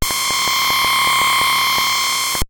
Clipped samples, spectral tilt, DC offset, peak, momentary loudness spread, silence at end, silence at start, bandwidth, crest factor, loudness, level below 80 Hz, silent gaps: under 0.1%; 0 dB/octave; under 0.1%; -6 dBFS; 3 LU; 0.05 s; 0 s; 17.5 kHz; 12 dB; -14 LUFS; -36 dBFS; none